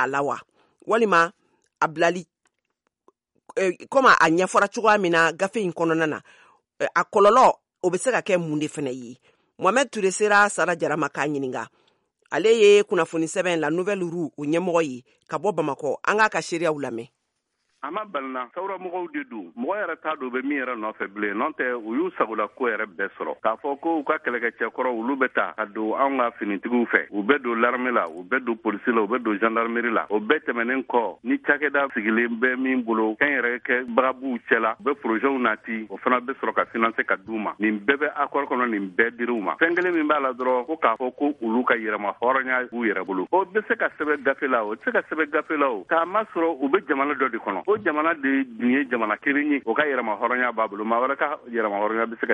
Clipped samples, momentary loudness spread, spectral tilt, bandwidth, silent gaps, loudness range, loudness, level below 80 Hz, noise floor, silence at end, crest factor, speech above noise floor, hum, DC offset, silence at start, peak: under 0.1%; 10 LU; -4.5 dB/octave; 11.5 kHz; none; 5 LU; -23 LUFS; -72 dBFS; -76 dBFS; 0 s; 22 dB; 53 dB; none; under 0.1%; 0 s; -2 dBFS